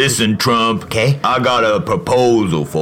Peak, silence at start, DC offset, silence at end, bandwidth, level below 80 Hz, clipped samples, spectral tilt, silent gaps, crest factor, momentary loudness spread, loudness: -2 dBFS; 0 s; under 0.1%; 0 s; 16.5 kHz; -44 dBFS; under 0.1%; -4.5 dB/octave; none; 12 dB; 3 LU; -14 LUFS